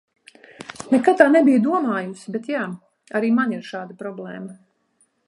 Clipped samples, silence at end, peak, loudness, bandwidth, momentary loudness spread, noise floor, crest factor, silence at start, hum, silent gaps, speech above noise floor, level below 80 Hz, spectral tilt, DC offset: under 0.1%; 0.7 s; -2 dBFS; -19 LUFS; 11.5 kHz; 22 LU; -65 dBFS; 20 dB; 0.6 s; none; none; 45 dB; -72 dBFS; -6.5 dB/octave; under 0.1%